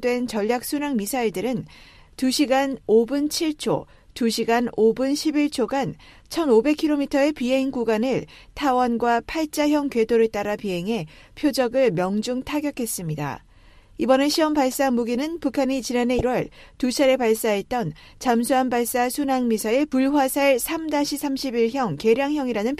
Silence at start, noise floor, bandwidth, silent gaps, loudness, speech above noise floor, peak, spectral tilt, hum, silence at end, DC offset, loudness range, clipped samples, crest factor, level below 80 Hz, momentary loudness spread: 0 s; -50 dBFS; 15.5 kHz; none; -22 LUFS; 28 dB; -6 dBFS; -4.5 dB/octave; none; 0 s; under 0.1%; 2 LU; under 0.1%; 18 dB; -50 dBFS; 8 LU